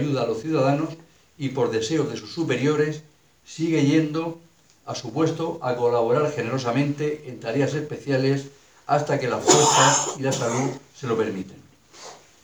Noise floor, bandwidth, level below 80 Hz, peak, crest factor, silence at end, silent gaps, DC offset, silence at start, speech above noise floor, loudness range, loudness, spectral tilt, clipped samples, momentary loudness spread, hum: -45 dBFS; over 20 kHz; -66 dBFS; -2 dBFS; 22 dB; 0.3 s; none; under 0.1%; 0 s; 22 dB; 4 LU; -23 LUFS; -4.5 dB/octave; under 0.1%; 17 LU; none